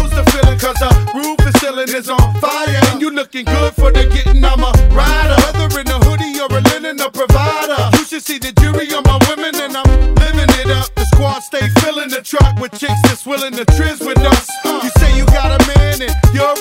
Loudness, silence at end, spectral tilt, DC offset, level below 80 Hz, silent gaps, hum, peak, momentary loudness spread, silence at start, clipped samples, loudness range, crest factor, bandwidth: -13 LUFS; 0 s; -5 dB/octave; under 0.1%; -14 dBFS; none; none; 0 dBFS; 7 LU; 0 s; 0.3%; 1 LU; 10 dB; 16.5 kHz